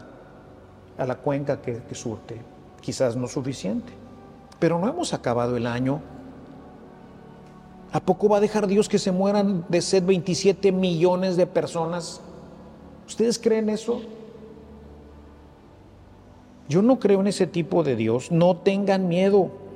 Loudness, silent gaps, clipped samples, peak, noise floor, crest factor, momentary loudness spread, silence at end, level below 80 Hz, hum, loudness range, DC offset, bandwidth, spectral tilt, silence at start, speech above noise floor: -23 LUFS; none; under 0.1%; -6 dBFS; -49 dBFS; 18 dB; 22 LU; 0 s; -56 dBFS; none; 8 LU; under 0.1%; 12 kHz; -6 dB/octave; 0 s; 26 dB